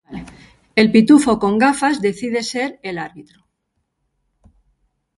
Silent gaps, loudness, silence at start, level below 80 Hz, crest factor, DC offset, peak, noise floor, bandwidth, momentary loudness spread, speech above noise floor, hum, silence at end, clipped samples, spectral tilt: none; -16 LUFS; 0.1 s; -52 dBFS; 18 dB; under 0.1%; 0 dBFS; -72 dBFS; 11.5 kHz; 18 LU; 57 dB; none; 1.95 s; under 0.1%; -5 dB/octave